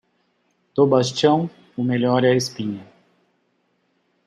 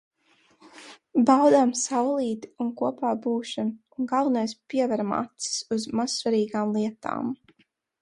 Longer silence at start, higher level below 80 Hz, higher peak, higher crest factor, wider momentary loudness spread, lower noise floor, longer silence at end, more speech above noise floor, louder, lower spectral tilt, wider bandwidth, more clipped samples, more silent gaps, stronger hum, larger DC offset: about the same, 0.75 s vs 0.65 s; about the same, -68 dBFS vs -70 dBFS; about the same, -4 dBFS vs -6 dBFS; about the same, 18 dB vs 20 dB; about the same, 12 LU vs 12 LU; about the same, -67 dBFS vs -67 dBFS; first, 1.45 s vs 0.65 s; first, 49 dB vs 43 dB; first, -20 LUFS vs -25 LUFS; first, -5.5 dB/octave vs -4 dB/octave; about the same, 12.5 kHz vs 11.5 kHz; neither; neither; first, 60 Hz at -45 dBFS vs none; neither